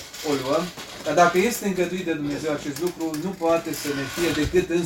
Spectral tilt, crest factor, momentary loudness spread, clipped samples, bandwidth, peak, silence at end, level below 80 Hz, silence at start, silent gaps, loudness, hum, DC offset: -4.5 dB/octave; 18 dB; 9 LU; under 0.1%; 17 kHz; -6 dBFS; 0 s; -46 dBFS; 0 s; none; -24 LUFS; none; under 0.1%